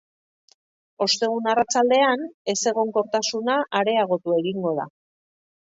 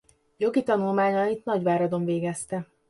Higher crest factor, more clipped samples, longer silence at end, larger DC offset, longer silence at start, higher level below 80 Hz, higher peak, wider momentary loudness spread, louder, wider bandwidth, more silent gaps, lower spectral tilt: about the same, 18 dB vs 16 dB; neither; first, 0.9 s vs 0.25 s; neither; first, 1 s vs 0.4 s; about the same, -72 dBFS vs -68 dBFS; first, -6 dBFS vs -10 dBFS; about the same, 7 LU vs 7 LU; first, -22 LUFS vs -26 LUFS; second, 8 kHz vs 11.5 kHz; first, 2.34-2.45 s vs none; second, -3 dB/octave vs -6.5 dB/octave